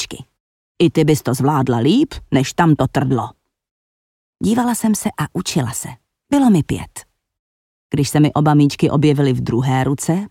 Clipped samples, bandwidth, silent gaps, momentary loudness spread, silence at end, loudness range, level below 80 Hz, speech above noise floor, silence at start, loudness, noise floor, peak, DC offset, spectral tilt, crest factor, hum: under 0.1%; 16.5 kHz; 0.40-0.75 s, 3.71-4.33 s, 7.39-7.90 s; 10 LU; 0.05 s; 4 LU; -44 dBFS; over 74 dB; 0 s; -17 LUFS; under -90 dBFS; -4 dBFS; under 0.1%; -6 dB/octave; 14 dB; none